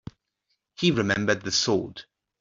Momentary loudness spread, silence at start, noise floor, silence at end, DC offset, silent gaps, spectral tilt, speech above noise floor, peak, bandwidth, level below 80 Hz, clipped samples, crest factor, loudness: 12 LU; 0.8 s; -77 dBFS; 0.4 s; under 0.1%; none; -4 dB/octave; 53 dB; -8 dBFS; 7.8 kHz; -58 dBFS; under 0.1%; 20 dB; -24 LUFS